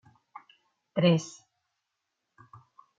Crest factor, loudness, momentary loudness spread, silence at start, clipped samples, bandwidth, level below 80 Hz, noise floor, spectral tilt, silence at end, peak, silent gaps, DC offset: 22 dB; -27 LUFS; 27 LU; 0.95 s; under 0.1%; 7.8 kHz; -76 dBFS; -83 dBFS; -6.5 dB/octave; 1.7 s; -10 dBFS; none; under 0.1%